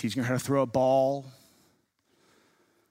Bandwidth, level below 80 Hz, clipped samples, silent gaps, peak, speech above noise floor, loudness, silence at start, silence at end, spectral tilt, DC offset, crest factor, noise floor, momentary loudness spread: 16 kHz; -68 dBFS; under 0.1%; none; -12 dBFS; 44 dB; -27 LUFS; 0 s; 1.6 s; -6 dB/octave; under 0.1%; 16 dB; -70 dBFS; 6 LU